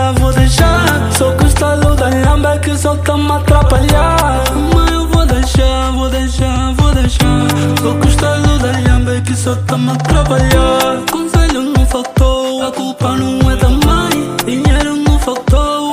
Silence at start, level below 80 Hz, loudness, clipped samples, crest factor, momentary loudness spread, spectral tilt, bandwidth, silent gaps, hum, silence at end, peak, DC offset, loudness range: 0 s; -14 dBFS; -12 LUFS; under 0.1%; 10 dB; 5 LU; -5.5 dB/octave; 16 kHz; none; none; 0 s; 0 dBFS; under 0.1%; 2 LU